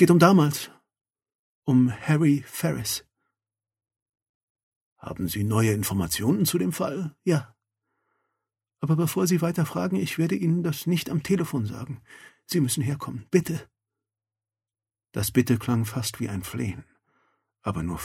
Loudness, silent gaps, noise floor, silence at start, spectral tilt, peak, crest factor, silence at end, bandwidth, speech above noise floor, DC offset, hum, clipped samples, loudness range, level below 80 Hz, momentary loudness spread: -25 LUFS; 1.35-1.62 s, 4.02-4.06 s, 4.29-4.55 s, 4.63-4.96 s; under -90 dBFS; 0 s; -6 dB/octave; -4 dBFS; 22 dB; 0 s; 16.5 kHz; over 66 dB; under 0.1%; none; under 0.1%; 4 LU; -56 dBFS; 11 LU